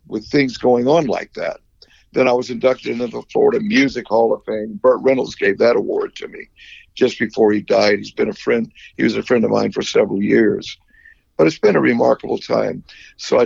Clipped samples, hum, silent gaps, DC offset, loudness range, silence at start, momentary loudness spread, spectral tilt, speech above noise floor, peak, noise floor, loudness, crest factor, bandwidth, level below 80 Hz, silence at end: under 0.1%; none; none; under 0.1%; 2 LU; 0.1 s; 13 LU; -5.5 dB/octave; 34 dB; -2 dBFS; -51 dBFS; -17 LUFS; 14 dB; 7.6 kHz; -54 dBFS; 0 s